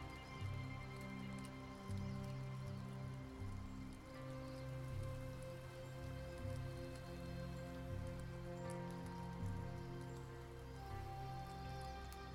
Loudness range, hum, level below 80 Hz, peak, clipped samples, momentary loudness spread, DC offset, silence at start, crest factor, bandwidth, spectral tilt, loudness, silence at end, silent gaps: 1 LU; none; -58 dBFS; -36 dBFS; under 0.1%; 5 LU; under 0.1%; 0 s; 12 dB; 16 kHz; -6.5 dB/octave; -50 LUFS; 0 s; none